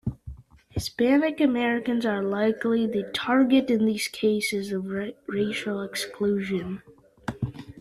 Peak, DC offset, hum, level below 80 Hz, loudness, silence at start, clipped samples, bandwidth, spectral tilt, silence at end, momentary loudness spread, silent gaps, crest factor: -8 dBFS; under 0.1%; none; -52 dBFS; -25 LUFS; 0.05 s; under 0.1%; 14 kHz; -5.5 dB/octave; 0 s; 14 LU; none; 16 dB